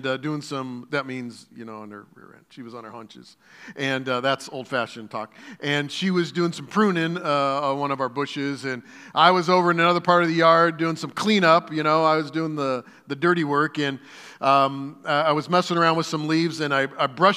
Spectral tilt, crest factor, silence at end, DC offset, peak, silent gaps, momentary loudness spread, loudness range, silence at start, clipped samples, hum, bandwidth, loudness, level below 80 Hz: -5.5 dB/octave; 22 dB; 0 s; under 0.1%; -2 dBFS; none; 20 LU; 11 LU; 0 s; under 0.1%; none; 14 kHz; -22 LUFS; -80 dBFS